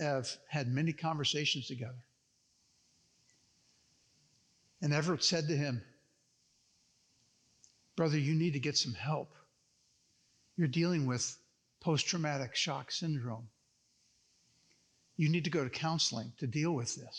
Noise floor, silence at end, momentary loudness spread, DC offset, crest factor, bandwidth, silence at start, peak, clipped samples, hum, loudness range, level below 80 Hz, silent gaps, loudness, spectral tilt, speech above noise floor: -75 dBFS; 0 s; 12 LU; under 0.1%; 20 dB; 9.8 kHz; 0 s; -18 dBFS; under 0.1%; none; 4 LU; -82 dBFS; none; -34 LUFS; -4.5 dB/octave; 40 dB